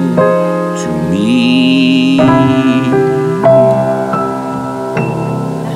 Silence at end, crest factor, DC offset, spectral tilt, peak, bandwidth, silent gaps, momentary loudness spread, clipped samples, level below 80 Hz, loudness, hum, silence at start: 0 s; 10 dB; under 0.1%; -6.5 dB/octave; 0 dBFS; 12 kHz; none; 9 LU; under 0.1%; -46 dBFS; -11 LUFS; none; 0 s